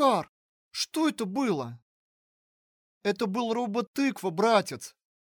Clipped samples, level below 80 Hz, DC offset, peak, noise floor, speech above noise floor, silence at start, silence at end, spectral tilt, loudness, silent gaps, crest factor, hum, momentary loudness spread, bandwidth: under 0.1%; -76 dBFS; under 0.1%; -10 dBFS; under -90 dBFS; over 62 dB; 0 s; 0.35 s; -4.5 dB/octave; -28 LUFS; 0.29-0.71 s, 1.82-3.01 s, 3.87-3.94 s; 20 dB; none; 16 LU; over 20 kHz